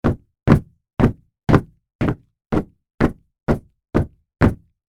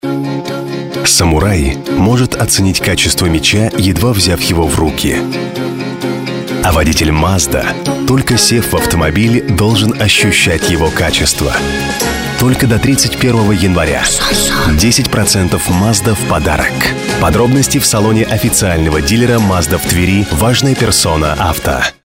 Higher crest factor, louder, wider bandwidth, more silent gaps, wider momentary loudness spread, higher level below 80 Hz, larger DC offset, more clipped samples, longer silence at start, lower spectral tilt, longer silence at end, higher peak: first, 20 dB vs 12 dB; second, -21 LUFS vs -11 LUFS; second, 12.5 kHz vs 16.5 kHz; first, 1.95-1.99 s, 2.94-2.98 s vs none; first, 12 LU vs 6 LU; second, -32 dBFS vs -24 dBFS; first, 0.2% vs under 0.1%; neither; about the same, 0.05 s vs 0.05 s; first, -9 dB/octave vs -4 dB/octave; first, 0.35 s vs 0.15 s; about the same, 0 dBFS vs 0 dBFS